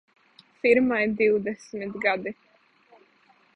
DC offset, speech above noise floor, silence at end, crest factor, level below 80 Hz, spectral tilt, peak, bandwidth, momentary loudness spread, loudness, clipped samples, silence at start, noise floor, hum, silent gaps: under 0.1%; 37 dB; 1.25 s; 20 dB; -64 dBFS; -6 dB/octave; -6 dBFS; 9.6 kHz; 14 LU; -24 LUFS; under 0.1%; 0.65 s; -61 dBFS; none; none